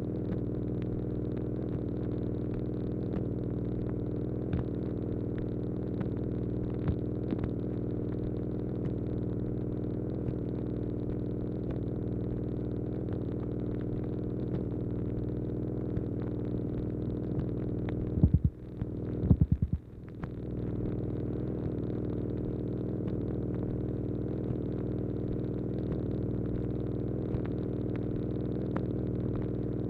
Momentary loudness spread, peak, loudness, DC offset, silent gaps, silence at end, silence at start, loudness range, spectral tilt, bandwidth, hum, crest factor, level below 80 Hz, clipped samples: 2 LU; -10 dBFS; -34 LUFS; under 0.1%; none; 0 s; 0 s; 3 LU; -12 dB/octave; 4.4 kHz; 60 Hz at -45 dBFS; 22 dB; -42 dBFS; under 0.1%